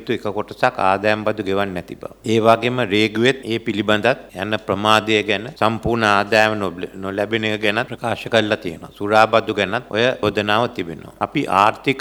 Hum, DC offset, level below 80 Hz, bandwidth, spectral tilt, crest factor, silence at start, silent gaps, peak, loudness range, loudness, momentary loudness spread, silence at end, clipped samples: none; under 0.1%; -50 dBFS; over 20 kHz; -5 dB/octave; 18 dB; 0 s; none; 0 dBFS; 2 LU; -18 LUFS; 10 LU; 0 s; under 0.1%